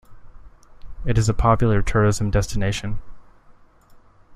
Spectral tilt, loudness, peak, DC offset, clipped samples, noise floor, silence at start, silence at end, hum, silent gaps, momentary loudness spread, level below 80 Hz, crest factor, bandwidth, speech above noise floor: -6 dB/octave; -21 LUFS; -4 dBFS; under 0.1%; under 0.1%; -50 dBFS; 0.1 s; 0.35 s; none; none; 13 LU; -30 dBFS; 18 dB; 12.5 kHz; 31 dB